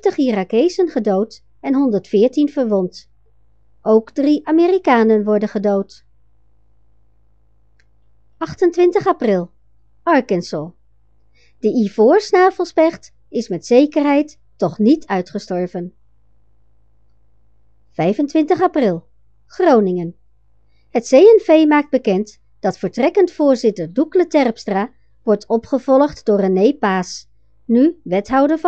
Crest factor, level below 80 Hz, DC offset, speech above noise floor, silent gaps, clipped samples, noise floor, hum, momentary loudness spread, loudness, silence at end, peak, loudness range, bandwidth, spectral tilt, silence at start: 16 dB; -56 dBFS; 0.3%; 43 dB; none; under 0.1%; -58 dBFS; none; 13 LU; -16 LUFS; 0 s; 0 dBFS; 7 LU; 8.2 kHz; -6.5 dB/octave; 0.05 s